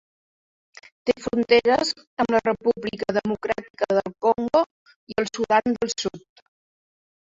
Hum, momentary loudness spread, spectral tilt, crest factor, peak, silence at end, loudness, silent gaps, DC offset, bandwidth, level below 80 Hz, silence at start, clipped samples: none; 9 LU; -4 dB/octave; 20 dB; -4 dBFS; 1.05 s; -23 LUFS; 2.07-2.17 s, 3.70-3.74 s, 4.66-4.86 s, 4.96-5.07 s; under 0.1%; 7.8 kHz; -58 dBFS; 1.05 s; under 0.1%